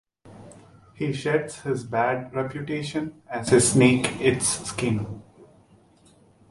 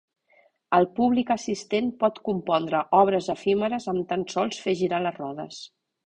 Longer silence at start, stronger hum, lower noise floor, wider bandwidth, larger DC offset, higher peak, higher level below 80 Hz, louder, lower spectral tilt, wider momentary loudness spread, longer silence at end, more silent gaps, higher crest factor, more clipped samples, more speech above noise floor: second, 0.25 s vs 0.7 s; neither; second, -57 dBFS vs -62 dBFS; first, 11.5 kHz vs 9.6 kHz; neither; about the same, -4 dBFS vs -6 dBFS; first, -54 dBFS vs -64 dBFS; about the same, -24 LUFS vs -25 LUFS; about the same, -4.5 dB/octave vs -5.5 dB/octave; about the same, 13 LU vs 13 LU; first, 1.05 s vs 0.4 s; neither; about the same, 20 dB vs 20 dB; neither; second, 33 dB vs 38 dB